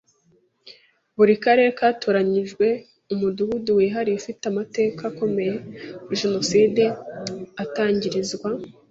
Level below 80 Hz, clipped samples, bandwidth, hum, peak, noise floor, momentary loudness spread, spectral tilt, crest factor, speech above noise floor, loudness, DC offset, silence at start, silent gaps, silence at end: -62 dBFS; under 0.1%; 8 kHz; none; -4 dBFS; -62 dBFS; 14 LU; -5 dB/octave; 18 dB; 41 dB; -22 LUFS; under 0.1%; 0.65 s; none; 0.2 s